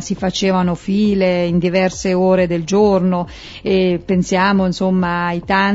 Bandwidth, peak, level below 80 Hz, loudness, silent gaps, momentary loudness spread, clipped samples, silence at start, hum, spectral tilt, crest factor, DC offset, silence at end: 8 kHz; -2 dBFS; -40 dBFS; -16 LUFS; none; 5 LU; under 0.1%; 0 s; none; -6 dB/octave; 14 dB; under 0.1%; 0 s